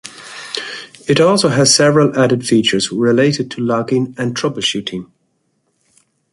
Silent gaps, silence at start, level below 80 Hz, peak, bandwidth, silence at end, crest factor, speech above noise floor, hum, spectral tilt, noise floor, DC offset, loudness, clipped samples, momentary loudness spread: none; 0.05 s; -56 dBFS; 0 dBFS; 11.5 kHz; 1.3 s; 16 dB; 50 dB; none; -4 dB/octave; -65 dBFS; under 0.1%; -14 LUFS; under 0.1%; 16 LU